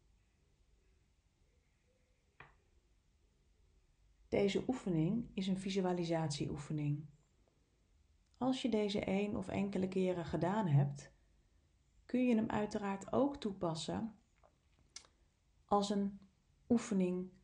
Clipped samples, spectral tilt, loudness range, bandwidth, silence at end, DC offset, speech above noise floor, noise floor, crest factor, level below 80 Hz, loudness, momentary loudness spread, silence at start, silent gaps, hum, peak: under 0.1%; -6.5 dB/octave; 4 LU; 10 kHz; 0.15 s; under 0.1%; 39 dB; -75 dBFS; 18 dB; -66 dBFS; -37 LUFS; 8 LU; 2.4 s; none; none; -20 dBFS